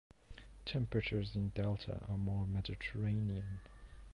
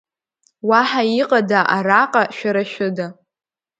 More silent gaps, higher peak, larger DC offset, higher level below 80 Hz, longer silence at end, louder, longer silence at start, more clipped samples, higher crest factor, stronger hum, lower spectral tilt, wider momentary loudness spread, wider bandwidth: neither; second, -24 dBFS vs 0 dBFS; neither; first, -52 dBFS vs -70 dBFS; second, 0 s vs 0.65 s; second, -40 LUFS vs -17 LUFS; second, 0.3 s vs 0.65 s; neither; about the same, 16 dB vs 18 dB; neither; first, -8 dB/octave vs -5.5 dB/octave; first, 21 LU vs 9 LU; about the same, 9.6 kHz vs 9 kHz